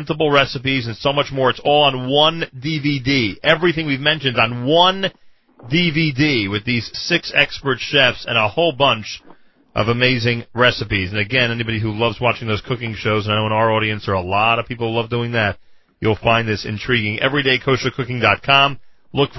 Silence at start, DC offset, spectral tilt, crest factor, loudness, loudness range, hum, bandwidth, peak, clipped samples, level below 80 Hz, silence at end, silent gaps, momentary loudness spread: 0 s; under 0.1%; -5.5 dB/octave; 18 dB; -17 LUFS; 2 LU; none; 6.2 kHz; 0 dBFS; under 0.1%; -44 dBFS; 0 s; none; 8 LU